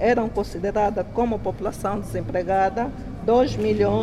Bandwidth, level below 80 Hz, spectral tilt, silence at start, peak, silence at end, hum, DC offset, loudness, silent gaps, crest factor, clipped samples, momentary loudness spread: 14 kHz; -40 dBFS; -7 dB/octave; 0 s; -8 dBFS; 0 s; none; under 0.1%; -23 LUFS; none; 14 dB; under 0.1%; 8 LU